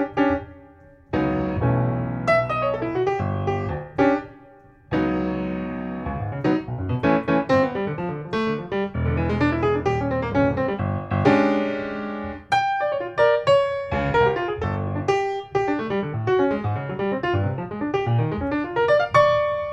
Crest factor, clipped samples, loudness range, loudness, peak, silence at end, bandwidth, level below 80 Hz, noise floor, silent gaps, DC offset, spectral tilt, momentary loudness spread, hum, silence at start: 18 dB; under 0.1%; 3 LU; -23 LUFS; -4 dBFS; 0 s; 9.4 kHz; -42 dBFS; -49 dBFS; none; under 0.1%; -7.5 dB/octave; 9 LU; none; 0 s